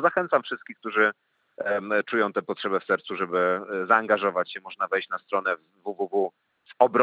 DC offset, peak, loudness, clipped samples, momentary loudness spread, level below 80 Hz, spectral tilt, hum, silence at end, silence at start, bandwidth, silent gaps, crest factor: under 0.1%; -4 dBFS; -26 LUFS; under 0.1%; 10 LU; -90 dBFS; -7 dB/octave; none; 0 s; 0 s; 7 kHz; none; 22 dB